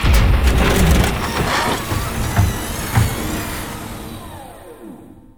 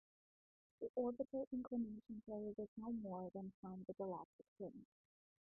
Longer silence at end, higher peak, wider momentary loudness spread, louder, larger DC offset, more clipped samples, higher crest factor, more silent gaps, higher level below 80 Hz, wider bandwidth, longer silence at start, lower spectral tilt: second, 0.15 s vs 0.65 s; first, -2 dBFS vs -32 dBFS; first, 21 LU vs 10 LU; first, -18 LUFS vs -49 LUFS; neither; neither; about the same, 16 dB vs 18 dB; second, none vs 0.89-0.94 s, 1.47-1.51 s, 2.68-2.76 s, 3.54-3.63 s, 4.25-4.39 s, 4.48-4.56 s; first, -22 dBFS vs -80 dBFS; first, over 20 kHz vs 1.6 kHz; second, 0 s vs 0.8 s; first, -5 dB/octave vs -2 dB/octave